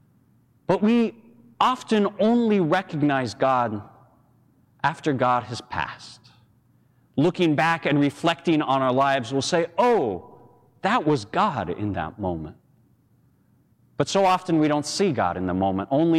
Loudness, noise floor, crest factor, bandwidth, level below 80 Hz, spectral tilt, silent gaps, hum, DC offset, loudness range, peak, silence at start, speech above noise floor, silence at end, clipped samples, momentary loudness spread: -23 LUFS; -61 dBFS; 18 dB; 12.5 kHz; -58 dBFS; -5.5 dB/octave; none; none; under 0.1%; 5 LU; -6 dBFS; 0.7 s; 39 dB; 0 s; under 0.1%; 10 LU